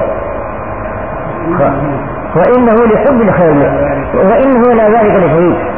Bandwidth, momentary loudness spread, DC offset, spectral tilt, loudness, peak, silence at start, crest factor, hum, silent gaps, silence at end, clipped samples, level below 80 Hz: 3.6 kHz; 12 LU; 3%; -12 dB/octave; -10 LUFS; 0 dBFS; 0 s; 10 dB; none; none; 0 s; under 0.1%; -30 dBFS